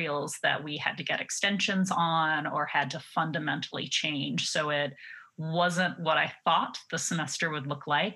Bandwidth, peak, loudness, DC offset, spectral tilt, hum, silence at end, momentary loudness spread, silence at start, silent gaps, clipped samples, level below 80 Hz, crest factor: 12.5 kHz; -10 dBFS; -29 LUFS; under 0.1%; -3.5 dB/octave; none; 0 s; 6 LU; 0 s; none; under 0.1%; -86 dBFS; 20 dB